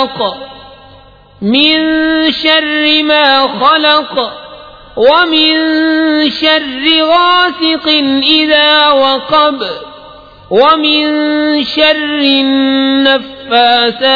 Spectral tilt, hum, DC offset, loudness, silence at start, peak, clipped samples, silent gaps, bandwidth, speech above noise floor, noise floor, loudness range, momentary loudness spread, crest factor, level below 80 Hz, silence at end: -5 dB/octave; none; under 0.1%; -9 LUFS; 0 s; 0 dBFS; 0.2%; none; 5.4 kHz; 29 dB; -39 dBFS; 2 LU; 8 LU; 10 dB; -46 dBFS; 0 s